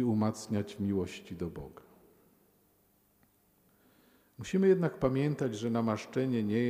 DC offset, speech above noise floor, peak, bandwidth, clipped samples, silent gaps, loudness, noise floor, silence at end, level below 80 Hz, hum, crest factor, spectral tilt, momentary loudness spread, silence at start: under 0.1%; 38 dB; -14 dBFS; 15.5 kHz; under 0.1%; none; -32 LUFS; -69 dBFS; 0 s; -62 dBFS; none; 20 dB; -7 dB/octave; 13 LU; 0 s